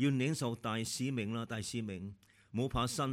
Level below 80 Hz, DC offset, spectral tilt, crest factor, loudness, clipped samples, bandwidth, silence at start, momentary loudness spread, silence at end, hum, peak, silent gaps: -56 dBFS; under 0.1%; -5 dB/octave; 16 dB; -37 LUFS; under 0.1%; 16 kHz; 0 s; 9 LU; 0 s; none; -22 dBFS; none